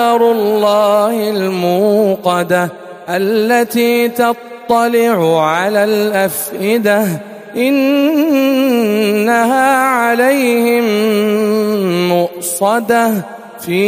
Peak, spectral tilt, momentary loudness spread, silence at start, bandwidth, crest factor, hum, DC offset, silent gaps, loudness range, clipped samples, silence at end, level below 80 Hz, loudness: 0 dBFS; -5 dB/octave; 6 LU; 0 s; 15.5 kHz; 12 dB; none; under 0.1%; none; 2 LU; under 0.1%; 0 s; -60 dBFS; -13 LUFS